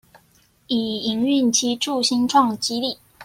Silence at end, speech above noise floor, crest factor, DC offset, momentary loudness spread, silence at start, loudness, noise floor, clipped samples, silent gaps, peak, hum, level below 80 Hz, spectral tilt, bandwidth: 0 s; 38 dB; 18 dB; under 0.1%; 8 LU; 0.7 s; -20 LUFS; -58 dBFS; under 0.1%; none; -4 dBFS; none; -62 dBFS; -2.5 dB/octave; 16 kHz